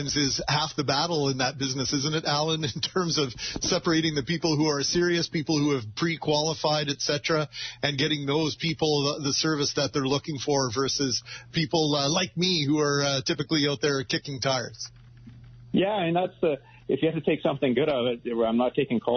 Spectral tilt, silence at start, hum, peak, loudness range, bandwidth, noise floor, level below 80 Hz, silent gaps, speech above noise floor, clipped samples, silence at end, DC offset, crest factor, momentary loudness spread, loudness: -3.5 dB/octave; 0 s; none; -10 dBFS; 2 LU; 6.6 kHz; -48 dBFS; -56 dBFS; none; 22 dB; under 0.1%; 0 s; under 0.1%; 16 dB; 4 LU; -26 LUFS